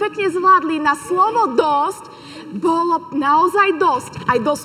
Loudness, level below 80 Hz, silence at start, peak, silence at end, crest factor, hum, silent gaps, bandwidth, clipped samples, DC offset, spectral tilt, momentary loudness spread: -16 LUFS; -58 dBFS; 0 s; -2 dBFS; 0 s; 16 dB; none; none; 15 kHz; under 0.1%; under 0.1%; -4.5 dB/octave; 9 LU